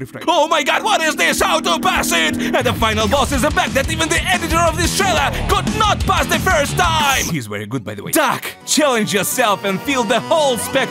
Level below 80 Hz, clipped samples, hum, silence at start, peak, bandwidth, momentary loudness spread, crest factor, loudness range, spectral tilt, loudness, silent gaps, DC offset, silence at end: -32 dBFS; under 0.1%; none; 0 s; -2 dBFS; 16 kHz; 4 LU; 14 dB; 1 LU; -3 dB/octave; -16 LUFS; none; under 0.1%; 0 s